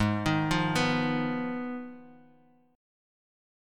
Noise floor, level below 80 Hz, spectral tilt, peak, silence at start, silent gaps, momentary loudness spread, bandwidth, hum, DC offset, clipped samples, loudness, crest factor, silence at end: -62 dBFS; -52 dBFS; -5.5 dB/octave; -12 dBFS; 0 s; none; 12 LU; 16.5 kHz; none; under 0.1%; under 0.1%; -29 LUFS; 18 dB; 1.6 s